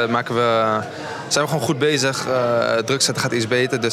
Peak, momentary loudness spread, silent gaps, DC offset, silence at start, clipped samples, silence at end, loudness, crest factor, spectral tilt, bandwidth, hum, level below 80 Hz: -2 dBFS; 4 LU; none; under 0.1%; 0 s; under 0.1%; 0 s; -19 LUFS; 18 dB; -3.5 dB/octave; 16 kHz; none; -68 dBFS